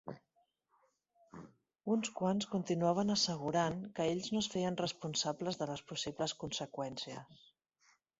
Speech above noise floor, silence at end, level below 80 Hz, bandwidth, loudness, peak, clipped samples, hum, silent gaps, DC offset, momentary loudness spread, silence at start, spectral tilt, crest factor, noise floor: 41 dB; 0.85 s; -72 dBFS; 8 kHz; -37 LUFS; -20 dBFS; under 0.1%; none; none; under 0.1%; 17 LU; 0.05 s; -4.5 dB/octave; 18 dB; -78 dBFS